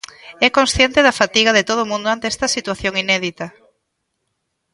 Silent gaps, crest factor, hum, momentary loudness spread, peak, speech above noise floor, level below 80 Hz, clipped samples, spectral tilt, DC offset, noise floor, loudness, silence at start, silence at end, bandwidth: none; 18 dB; none; 11 LU; 0 dBFS; 56 dB; -42 dBFS; under 0.1%; -2.5 dB/octave; under 0.1%; -73 dBFS; -16 LUFS; 0.25 s; 1.25 s; 11.5 kHz